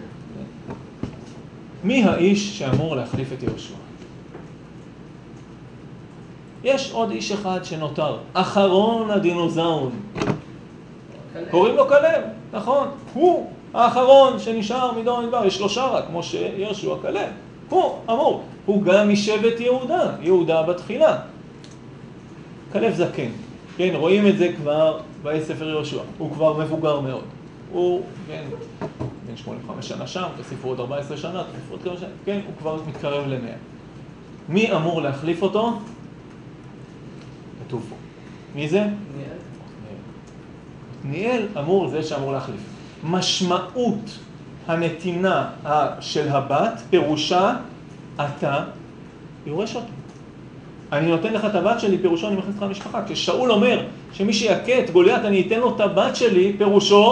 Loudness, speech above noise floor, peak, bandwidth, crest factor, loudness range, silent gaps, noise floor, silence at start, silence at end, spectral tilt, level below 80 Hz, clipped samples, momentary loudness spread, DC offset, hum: -21 LUFS; 20 dB; 0 dBFS; 9.8 kHz; 22 dB; 11 LU; none; -41 dBFS; 0 s; 0 s; -5.5 dB/octave; -54 dBFS; under 0.1%; 24 LU; under 0.1%; none